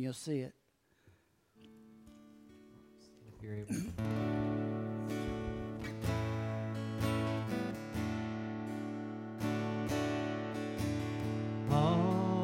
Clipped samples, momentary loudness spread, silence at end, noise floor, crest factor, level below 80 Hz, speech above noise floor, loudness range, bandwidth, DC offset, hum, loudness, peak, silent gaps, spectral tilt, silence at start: under 0.1%; 9 LU; 0 s; -69 dBFS; 18 dB; -56 dBFS; 31 dB; 11 LU; 16 kHz; under 0.1%; none; -37 LUFS; -18 dBFS; none; -7 dB/octave; 0 s